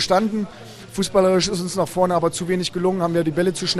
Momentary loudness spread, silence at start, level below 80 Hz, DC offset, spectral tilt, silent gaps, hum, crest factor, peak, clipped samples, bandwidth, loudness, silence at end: 9 LU; 0 s; -50 dBFS; under 0.1%; -5 dB/octave; none; none; 16 dB; -4 dBFS; under 0.1%; 14.5 kHz; -20 LUFS; 0 s